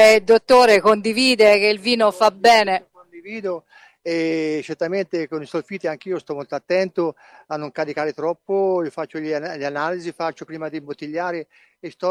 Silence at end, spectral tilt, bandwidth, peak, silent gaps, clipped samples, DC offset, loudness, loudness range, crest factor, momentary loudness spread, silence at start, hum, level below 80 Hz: 0 s; -4 dB/octave; 16 kHz; -2 dBFS; none; under 0.1%; under 0.1%; -19 LUFS; 10 LU; 18 dB; 17 LU; 0 s; none; -62 dBFS